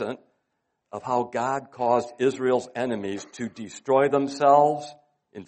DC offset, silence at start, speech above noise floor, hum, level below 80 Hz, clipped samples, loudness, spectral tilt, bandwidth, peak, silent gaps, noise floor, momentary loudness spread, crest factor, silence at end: under 0.1%; 0 s; 54 dB; none; -70 dBFS; under 0.1%; -24 LUFS; -5.5 dB/octave; 8.4 kHz; -6 dBFS; none; -77 dBFS; 17 LU; 20 dB; 0.05 s